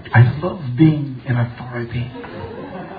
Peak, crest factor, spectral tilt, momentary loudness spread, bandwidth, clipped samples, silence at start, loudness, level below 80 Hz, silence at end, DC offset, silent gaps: 0 dBFS; 18 dB; -11.5 dB/octave; 17 LU; 4.8 kHz; under 0.1%; 0 s; -19 LUFS; -46 dBFS; 0 s; under 0.1%; none